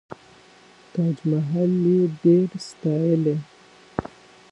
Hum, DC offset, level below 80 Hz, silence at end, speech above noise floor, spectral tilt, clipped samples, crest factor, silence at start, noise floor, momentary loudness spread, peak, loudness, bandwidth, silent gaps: none; under 0.1%; -58 dBFS; 0.45 s; 30 dB; -9 dB/octave; under 0.1%; 18 dB; 0.95 s; -51 dBFS; 14 LU; -4 dBFS; -22 LUFS; 8.8 kHz; none